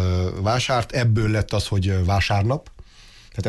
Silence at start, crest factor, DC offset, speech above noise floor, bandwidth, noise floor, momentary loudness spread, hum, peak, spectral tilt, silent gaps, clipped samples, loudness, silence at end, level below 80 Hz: 0 s; 12 dB; under 0.1%; 27 dB; 12 kHz; -47 dBFS; 4 LU; none; -10 dBFS; -6 dB/octave; none; under 0.1%; -21 LUFS; 0 s; -32 dBFS